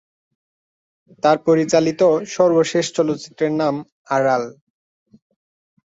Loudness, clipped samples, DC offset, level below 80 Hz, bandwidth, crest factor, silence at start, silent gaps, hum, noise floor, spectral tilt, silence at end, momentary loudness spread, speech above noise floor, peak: -18 LUFS; under 0.1%; under 0.1%; -64 dBFS; 8 kHz; 18 dB; 1.25 s; 3.92-4.05 s; none; under -90 dBFS; -5 dB/octave; 1.45 s; 7 LU; over 73 dB; -2 dBFS